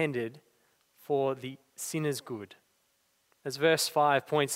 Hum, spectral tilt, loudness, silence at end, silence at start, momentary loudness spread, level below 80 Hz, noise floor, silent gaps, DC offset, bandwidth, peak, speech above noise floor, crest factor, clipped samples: none; -4 dB/octave; -30 LUFS; 0 s; 0 s; 17 LU; -80 dBFS; -73 dBFS; none; under 0.1%; 16 kHz; -12 dBFS; 43 dB; 20 dB; under 0.1%